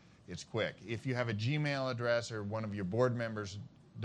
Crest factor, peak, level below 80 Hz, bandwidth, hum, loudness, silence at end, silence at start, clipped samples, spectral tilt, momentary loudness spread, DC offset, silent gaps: 18 dB; -18 dBFS; -70 dBFS; 10 kHz; none; -36 LUFS; 0 s; 0.3 s; under 0.1%; -6 dB/octave; 13 LU; under 0.1%; none